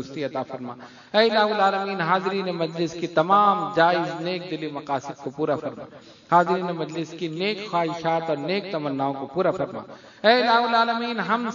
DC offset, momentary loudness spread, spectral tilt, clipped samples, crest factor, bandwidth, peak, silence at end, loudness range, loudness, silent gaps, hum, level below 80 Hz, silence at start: under 0.1%; 12 LU; -5.5 dB/octave; under 0.1%; 20 dB; 7.4 kHz; -2 dBFS; 0 s; 4 LU; -23 LUFS; none; none; -70 dBFS; 0 s